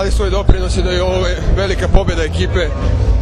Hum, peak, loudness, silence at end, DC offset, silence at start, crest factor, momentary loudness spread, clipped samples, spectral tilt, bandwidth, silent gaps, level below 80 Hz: none; 0 dBFS; -16 LUFS; 0 s; under 0.1%; 0 s; 14 dB; 2 LU; 0.4%; -6 dB/octave; 10.5 kHz; none; -16 dBFS